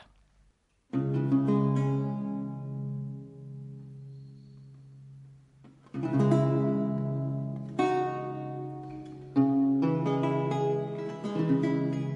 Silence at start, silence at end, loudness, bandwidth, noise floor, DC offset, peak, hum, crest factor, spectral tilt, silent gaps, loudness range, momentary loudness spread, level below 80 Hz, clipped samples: 0 s; 0 s; -29 LUFS; 7.8 kHz; -67 dBFS; under 0.1%; -12 dBFS; none; 18 dB; -9 dB/octave; none; 11 LU; 19 LU; -66 dBFS; under 0.1%